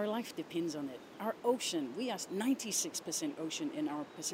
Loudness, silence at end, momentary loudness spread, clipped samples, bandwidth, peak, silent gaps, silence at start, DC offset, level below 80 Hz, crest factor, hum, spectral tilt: -37 LUFS; 0 s; 7 LU; under 0.1%; 16 kHz; -20 dBFS; none; 0 s; under 0.1%; -84 dBFS; 18 dB; none; -3 dB/octave